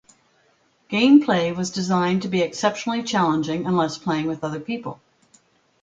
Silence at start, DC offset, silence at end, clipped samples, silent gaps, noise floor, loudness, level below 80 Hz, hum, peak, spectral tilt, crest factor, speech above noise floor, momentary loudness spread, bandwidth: 0.9 s; under 0.1%; 0.9 s; under 0.1%; none; -62 dBFS; -21 LUFS; -60 dBFS; none; -4 dBFS; -5.5 dB/octave; 18 dB; 41 dB; 13 LU; 9 kHz